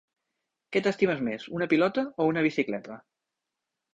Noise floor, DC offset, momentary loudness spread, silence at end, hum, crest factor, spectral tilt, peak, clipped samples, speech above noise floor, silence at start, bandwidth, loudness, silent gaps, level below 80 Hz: -86 dBFS; under 0.1%; 10 LU; 0.95 s; none; 18 dB; -6.5 dB/octave; -10 dBFS; under 0.1%; 59 dB; 0.7 s; 8 kHz; -27 LUFS; none; -70 dBFS